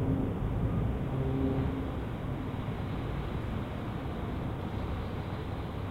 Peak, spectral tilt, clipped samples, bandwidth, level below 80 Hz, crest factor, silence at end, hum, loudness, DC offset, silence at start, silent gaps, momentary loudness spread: -18 dBFS; -8.5 dB/octave; under 0.1%; 15.5 kHz; -40 dBFS; 16 dB; 0 s; none; -35 LUFS; under 0.1%; 0 s; none; 6 LU